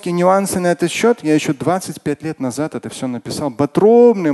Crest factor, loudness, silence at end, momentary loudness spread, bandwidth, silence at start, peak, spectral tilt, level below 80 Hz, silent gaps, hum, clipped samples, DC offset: 16 dB; -16 LUFS; 0 s; 13 LU; 12.5 kHz; 0.05 s; 0 dBFS; -5.5 dB/octave; -52 dBFS; none; none; under 0.1%; under 0.1%